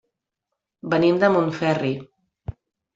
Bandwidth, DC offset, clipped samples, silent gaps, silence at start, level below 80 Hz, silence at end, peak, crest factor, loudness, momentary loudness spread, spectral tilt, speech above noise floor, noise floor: 7.6 kHz; under 0.1%; under 0.1%; none; 0.85 s; -54 dBFS; 0.45 s; -4 dBFS; 18 dB; -21 LUFS; 21 LU; -7.5 dB/octave; 63 dB; -83 dBFS